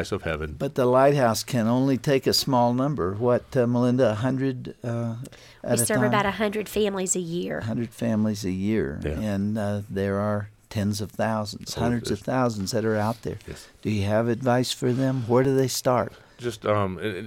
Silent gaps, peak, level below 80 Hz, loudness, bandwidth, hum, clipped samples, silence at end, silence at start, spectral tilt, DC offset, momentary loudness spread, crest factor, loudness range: none; -8 dBFS; -50 dBFS; -25 LUFS; 17 kHz; none; under 0.1%; 0 s; 0 s; -5.5 dB/octave; under 0.1%; 9 LU; 18 dB; 5 LU